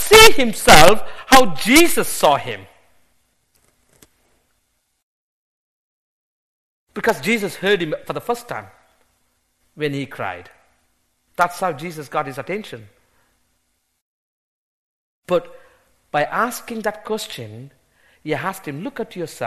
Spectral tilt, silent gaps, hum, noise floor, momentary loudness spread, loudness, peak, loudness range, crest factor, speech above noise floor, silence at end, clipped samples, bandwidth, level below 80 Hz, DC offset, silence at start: -3 dB/octave; 5.03-6.87 s, 14.01-15.23 s; none; -68 dBFS; 22 LU; -17 LUFS; 0 dBFS; 16 LU; 20 dB; 51 dB; 0 s; under 0.1%; 13.5 kHz; -38 dBFS; under 0.1%; 0 s